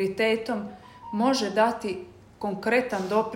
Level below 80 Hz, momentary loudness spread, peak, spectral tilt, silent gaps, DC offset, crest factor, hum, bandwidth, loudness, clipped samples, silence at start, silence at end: -62 dBFS; 12 LU; -8 dBFS; -4.5 dB/octave; none; under 0.1%; 18 dB; none; 16 kHz; -26 LUFS; under 0.1%; 0 s; 0 s